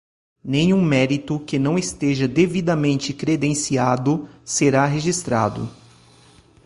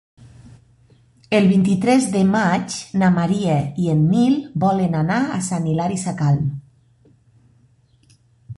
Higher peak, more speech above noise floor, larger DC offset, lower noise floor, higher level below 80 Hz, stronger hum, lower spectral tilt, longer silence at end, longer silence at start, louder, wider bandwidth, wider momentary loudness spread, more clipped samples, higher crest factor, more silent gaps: about the same, -4 dBFS vs -4 dBFS; second, 31 dB vs 39 dB; neither; second, -51 dBFS vs -56 dBFS; about the same, -52 dBFS vs -52 dBFS; neither; about the same, -5.5 dB/octave vs -6.5 dB/octave; first, 0.9 s vs 0.05 s; first, 0.45 s vs 0.2 s; about the same, -20 LUFS vs -18 LUFS; about the same, 11.5 kHz vs 11.5 kHz; about the same, 7 LU vs 6 LU; neither; about the same, 18 dB vs 16 dB; neither